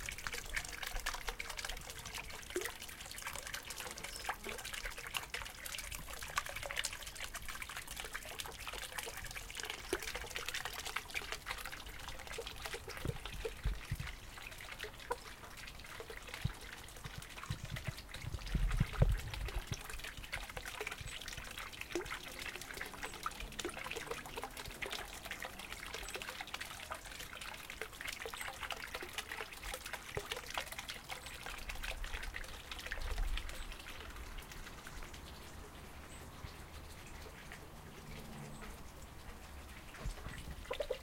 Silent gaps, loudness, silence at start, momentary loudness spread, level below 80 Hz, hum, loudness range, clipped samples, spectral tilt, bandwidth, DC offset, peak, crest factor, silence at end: none; -44 LUFS; 0 s; 10 LU; -50 dBFS; none; 9 LU; under 0.1%; -3 dB/octave; 17 kHz; under 0.1%; -16 dBFS; 28 dB; 0 s